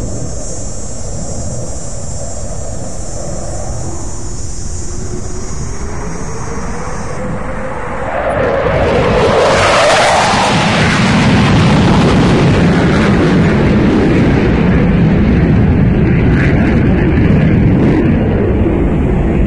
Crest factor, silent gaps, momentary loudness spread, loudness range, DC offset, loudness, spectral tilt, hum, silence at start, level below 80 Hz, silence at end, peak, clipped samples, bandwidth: 12 dB; none; 14 LU; 13 LU; 2%; -11 LUFS; -6 dB/octave; none; 0 s; -22 dBFS; 0 s; 0 dBFS; under 0.1%; 11.5 kHz